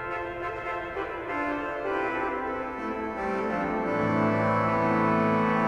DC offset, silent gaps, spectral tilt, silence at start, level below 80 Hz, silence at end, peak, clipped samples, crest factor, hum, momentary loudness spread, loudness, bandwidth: under 0.1%; none; -8 dB/octave; 0 s; -52 dBFS; 0 s; -12 dBFS; under 0.1%; 14 dB; none; 9 LU; -28 LUFS; 10 kHz